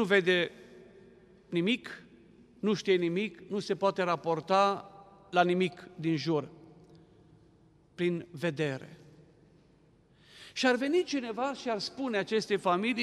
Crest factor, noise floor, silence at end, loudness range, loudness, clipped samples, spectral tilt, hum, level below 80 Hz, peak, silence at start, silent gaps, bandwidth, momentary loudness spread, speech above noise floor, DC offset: 22 dB; -63 dBFS; 0 s; 8 LU; -31 LUFS; under 0.1%; -5.5 dB/octave; none; -72 dBFS; -10 dBFS; 0 s; none; 12 kHz; 11 LU; 33 dB; under 0.1%